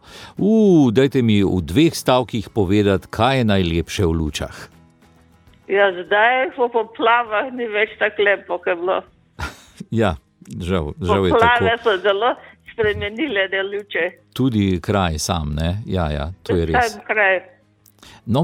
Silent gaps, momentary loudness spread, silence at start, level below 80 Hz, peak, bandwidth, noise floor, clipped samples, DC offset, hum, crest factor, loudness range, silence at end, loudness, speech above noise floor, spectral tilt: none; 10 LU; 0.1 s; -38 dBFS; -2 dBFS; 17 kHz; -52 dBFS; under 0.1%; under 0.1%; none; 18 dB; 4 LU; 0 s; -18 LUFS; 34 dB; -5.5 dB/octave